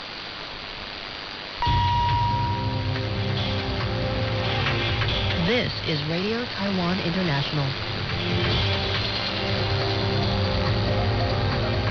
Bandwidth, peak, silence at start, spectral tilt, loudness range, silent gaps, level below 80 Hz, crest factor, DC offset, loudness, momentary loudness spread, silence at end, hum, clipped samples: 6.6 kHz; -12 dBFS; 0 s; -6.5 dB/octave; 1 LU; none; -36 dBFS; 12 dB; under 0.1%; -25 LUFS; 10 LU; 0 s; none; under 0.1%